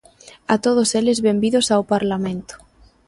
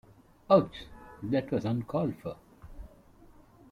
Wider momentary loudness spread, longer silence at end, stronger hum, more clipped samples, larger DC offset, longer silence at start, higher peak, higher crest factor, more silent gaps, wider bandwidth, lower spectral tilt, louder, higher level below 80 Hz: second, 13 LU vs 25 LU; second, 0.5 s vs 0.85 s; neither; neither; neither; about the same, 0.5 s vs 0.5 s; first, -4 dBFS vs -10 dBFS; second, 16 dB vs 22 dB; neither; about the same, 11.5 kHz vs 11.5 kHz; second, -4.5 dB/octave vs -8.5 dB/octave; first, -18 LUFS vs -29 LUFS; about the same, -54 dBFS vs -56 dBFS